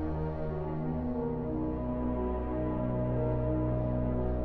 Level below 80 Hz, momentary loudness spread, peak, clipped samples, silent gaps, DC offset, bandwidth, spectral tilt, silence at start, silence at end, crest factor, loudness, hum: -40 dBFS; 4 LU; -20 dBFS; under 0.1%; none; under 0.1%; 4.4 kHz; -12 dB/octave; 0 s; 0 s; 12 dB; -33 LUFS; none